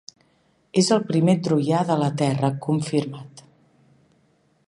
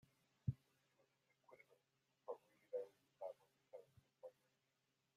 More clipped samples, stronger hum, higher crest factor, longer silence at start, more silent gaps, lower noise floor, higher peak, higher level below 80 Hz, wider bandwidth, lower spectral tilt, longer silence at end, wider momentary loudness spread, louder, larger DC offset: neither; neither; second, 18 dB vs 26 dB; first, 0.75 s vs 0.45 s; neither; second, -63 dBFS vs -87 dBFS; first, -6 dBFS vs -30 dBFS; first, -66 dBFS vs -80 dBFS; second, 11.5 kHz vs 14.5 kHz; second, -6 dB/octave vs -9 dB/octave; first, 1.25 s vs 0.85 s; second, 6 LU vs 16 LU; first, -22 LUFS vs -55 LUFS; neither